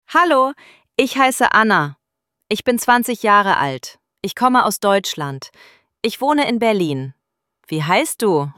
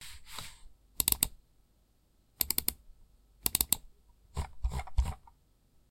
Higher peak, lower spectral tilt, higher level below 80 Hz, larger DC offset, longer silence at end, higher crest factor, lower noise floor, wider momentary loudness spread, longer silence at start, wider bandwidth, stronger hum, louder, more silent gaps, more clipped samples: first, 0 dBFS vs -4 dBFS; first, -4 dB/octave vs -1.5 dB/octave; second, -62 dBFS vs -42 dBFS; neither; second, 0.05 s vs 0.7 s; second, 16 dB vs 32 dB; first, -77 dBFS vs -68 dBFS; second, 13 LU vs 17 LU; about the same, 0.1 s vs 0 s; about the same, 17 kHz vs 17 kHz; neither; first, -17 LUFS vs -32 LUFS; neither; neither